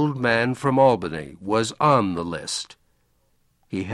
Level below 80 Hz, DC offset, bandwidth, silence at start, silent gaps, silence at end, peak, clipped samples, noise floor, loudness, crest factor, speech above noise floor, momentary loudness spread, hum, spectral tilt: -56 dBFS; under 0.1%; 12 kHz; 0 s; none; 0 s; -4 dBFS; under 0.1%; -65 dBFS; -22 LUFS; 18 dB; 43 dB; 13 LU; none; -5 dB/octave